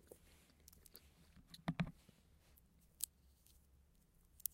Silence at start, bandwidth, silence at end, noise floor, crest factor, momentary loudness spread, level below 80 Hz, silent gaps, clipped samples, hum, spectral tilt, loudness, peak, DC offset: 0.1 s; 16 kHz; 0.05 s; -72 dBFS; 40 dB; 23 LU; -70 dBFS; none; under 0.1%; none; -4 dB/octave; -47 LUFS; -14 dBFS; under 0.1%